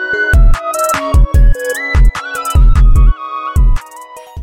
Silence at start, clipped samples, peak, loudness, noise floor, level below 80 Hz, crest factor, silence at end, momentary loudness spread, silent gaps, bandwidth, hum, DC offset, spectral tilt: 0 s; under 0.1%; 0 dBFS; -13 LUFS; -32 dBFS; -10 dBFS; 8 dB; 0 s; 9 LU; none; 16 kHz; none; under 0.1%; -5.5 dB/octave